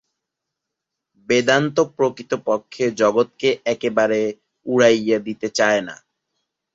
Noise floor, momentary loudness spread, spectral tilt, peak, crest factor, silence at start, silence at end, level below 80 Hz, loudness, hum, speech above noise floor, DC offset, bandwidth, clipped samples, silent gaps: -82 dBFS; 8 LU; -4.5 dB/octave; -2 dBFS; 18 dB; 1.3 s; 0.8 s; -64 dBFS; -19 LUFS; none; 63 dB; under 0.1%; 8 kHz; under 0.1%; none